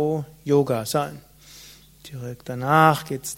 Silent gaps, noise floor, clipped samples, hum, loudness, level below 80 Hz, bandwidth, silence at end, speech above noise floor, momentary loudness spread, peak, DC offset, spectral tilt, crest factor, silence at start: none; -47 dBFS; under 0.1%; none; -22 LUFS; -58 dBFS; 16.5 kHz; 0 s; 25 dB; 19 LU; 0 dBFS; under 0.1%; -5.5 dB/octave; 22 dB; 0 s